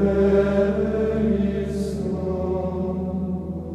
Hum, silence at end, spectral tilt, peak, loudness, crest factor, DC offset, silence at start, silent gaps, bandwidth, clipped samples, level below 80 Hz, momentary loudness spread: none; 0 s; -8.5 dB/octave; -8 dBFS; -23 LUFS; 14 dB; under 0.1%; 0 s; none; 11 kHz; under 0.1%; -36 dBFS; 8 LU